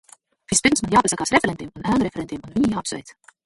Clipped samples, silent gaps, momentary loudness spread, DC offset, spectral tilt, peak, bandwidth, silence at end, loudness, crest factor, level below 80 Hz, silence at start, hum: under 0.1%; none; 12 LU; under 0.1%; -3.5 dB/octave; -2 dBFS; 11.5 kHz; 0.35 s; -21 LUFS; 20 dB; -48 dBFS; 0.5 s; none